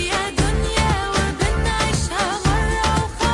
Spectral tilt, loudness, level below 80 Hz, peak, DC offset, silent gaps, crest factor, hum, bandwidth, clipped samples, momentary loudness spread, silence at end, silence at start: -4 dB/octave; -20 LUFS; -26 dBFS; -6 dBFS; under 0.1%; none; 14 dB; none; 11.5 kHz; under 0.1%; 2 LU; 0 s; 0 s